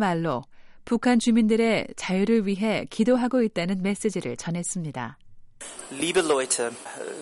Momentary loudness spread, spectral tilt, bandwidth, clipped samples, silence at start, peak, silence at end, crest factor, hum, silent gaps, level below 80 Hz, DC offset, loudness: 15 LU; -4.5 dB/octave; 11.5 kHz; under 0.1%; 0 s; -10 dBFS; 0 s; 16 dB; none; none; -56 dBFS; under 0.1%; -24 LUFS